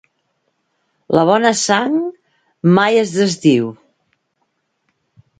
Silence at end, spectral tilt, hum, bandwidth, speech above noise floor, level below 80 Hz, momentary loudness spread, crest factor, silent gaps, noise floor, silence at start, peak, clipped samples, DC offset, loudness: 1.65 s; -5 dB/octave; none; 9.6 kHz; 55 dB; -58 dBFS; 7 LU; 18 dB; none; -68 dBFS; 1.1 s; 0 dBFS; under 0.1%; under 0.1%; -15 LUFS